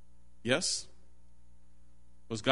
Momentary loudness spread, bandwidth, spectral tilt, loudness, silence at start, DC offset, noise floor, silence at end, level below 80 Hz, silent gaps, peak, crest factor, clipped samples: 14 LU; 10.5 kHz; -3 dB/octave; -33 LUFS; 0.45 s; 0.5%; -63 dBFS; 0 s; -62 dBFS; none; -6 dBFS; 30 dB; under 0.1%